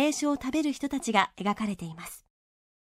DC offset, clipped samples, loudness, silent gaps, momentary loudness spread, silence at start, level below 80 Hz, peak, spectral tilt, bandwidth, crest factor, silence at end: under 0.1%; under 0.1%; -29 LUFS; none; 16 LU; 0 s; -60 dBFS; -6 dBFS; -4 dB/octave; 16 kHz; 24 dB; 0.75 s